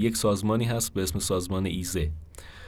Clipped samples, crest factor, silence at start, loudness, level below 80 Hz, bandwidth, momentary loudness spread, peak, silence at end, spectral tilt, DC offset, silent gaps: under 0.1%; 16 dB; 0 s; -27 LUFS; -40 dBFS; 19 kHz; 8 LU; -12 dBFS; 0 s; -5 dB/octave; under 0.1%; none